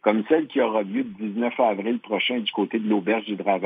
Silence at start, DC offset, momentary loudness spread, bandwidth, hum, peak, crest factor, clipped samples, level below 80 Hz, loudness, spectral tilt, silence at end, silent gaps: 0.05 s; under 0.1%; 5 LU; 4.8 kHz; none; -4 dBFS; 20 dB; under 0.1%; -78 dBFS; -24 LUFS; -8.5 dB/octave; 0 s; none